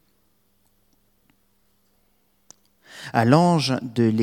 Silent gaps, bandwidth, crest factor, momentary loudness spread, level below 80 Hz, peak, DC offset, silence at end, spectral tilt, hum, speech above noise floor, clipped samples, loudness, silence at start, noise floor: none; 15.5 kHz; 24 dB; 20 LU; -68 dBFS; 0 dBFS; under 0.1%; 0 s; -6.5 dB/octave; none; 48 dB; under 0.1%; -20 LUFS; 2.95 s; -66 dBFS